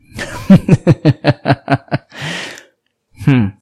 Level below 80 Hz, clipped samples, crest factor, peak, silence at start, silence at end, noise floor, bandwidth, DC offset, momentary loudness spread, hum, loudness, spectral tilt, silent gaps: -40 dBFS; 0.8%; 14 dB; 0 dBFS; 0.15 s; 0.1 s; -57 dBFS; 13 kHz; under 0.1%; 15 LU; none; -14 LUFS; -7.5 dB/octave; none